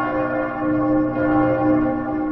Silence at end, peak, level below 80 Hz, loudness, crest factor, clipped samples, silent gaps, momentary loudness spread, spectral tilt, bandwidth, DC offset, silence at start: 0 s; -6 dBFS; -44 dBFS; -20 LUFS; 12 dB; under 0.1%; none; 5 LU; -10.5 dB/octave; 3.7 kHz; under 0.1%; 0 s